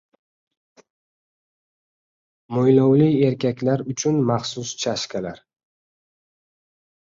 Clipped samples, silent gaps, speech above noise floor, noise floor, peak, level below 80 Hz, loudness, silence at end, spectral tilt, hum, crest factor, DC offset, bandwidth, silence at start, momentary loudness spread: under 0.1%; none; over 70 dB; under -90 dBFS; -4 dBFS; -62 dBFS; -20 LUFS; 1.7 s; -6 dB/octave; none; 20 dB; under 0.1%; 7.8 kHz; 2.5 s; 13 LU